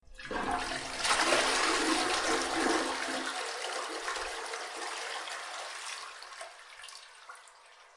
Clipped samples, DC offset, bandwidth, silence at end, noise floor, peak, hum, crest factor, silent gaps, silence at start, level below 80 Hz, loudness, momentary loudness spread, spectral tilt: under 0.1%; under 0.1%; 11.5 kHz; 0.1 s; -57 dBFS; -12 dBFS; none; 22 dB; none; 0.1 s; -60 dBFS; -32 LUFS; 20 LU; -1 dB/octave